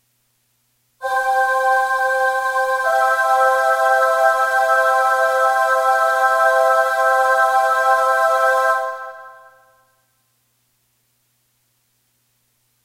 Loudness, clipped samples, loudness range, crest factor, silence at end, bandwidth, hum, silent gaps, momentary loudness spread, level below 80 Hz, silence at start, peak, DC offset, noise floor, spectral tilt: -16 LUFS; under 0.1%; 5 LU; 14 dB; 3.5 s; 16 kHz; none; none; 4 LU; -68 dBFS; 1 s; -4 dBFS; under 0.1%; -65 dBFS; 1 dB/octave